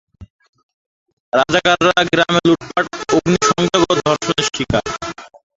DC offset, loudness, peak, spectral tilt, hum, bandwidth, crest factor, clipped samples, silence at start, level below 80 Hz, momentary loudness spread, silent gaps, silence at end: under 0.1%; -15 LUFS; 0 dBFS; -4 dB/octave; none; 8 kHz; 16 dB; under 0.1%; 0.2 s; -44 dBFS; 7 LU; 0.30-0.39 s, 0.49-0.53 s, 0.63-1.06 s, 1.13-1.32 s; 0.3 s